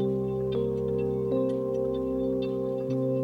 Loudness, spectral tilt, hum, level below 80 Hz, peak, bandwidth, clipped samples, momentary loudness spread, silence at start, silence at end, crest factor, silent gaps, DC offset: -29 LUFS; -9.5 dB/octave; none; -50 dBFS; -16 dBFS; 15.5 kHz; under 0.1%; 2 LU; 0 s; 0 s; 12 dB; none; under 0.1%